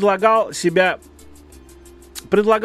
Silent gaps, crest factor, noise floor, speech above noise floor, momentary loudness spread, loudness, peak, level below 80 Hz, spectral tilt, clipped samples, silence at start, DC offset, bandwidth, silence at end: none; 18 dB; -43 dBFS; 27 dB; 18 LU; -17 LUFS; 0 dBFS; -50 dBFS; -4.5 dB/octave; under 0.1%; 0 s; under 0.1%; 14 kHz; 0 s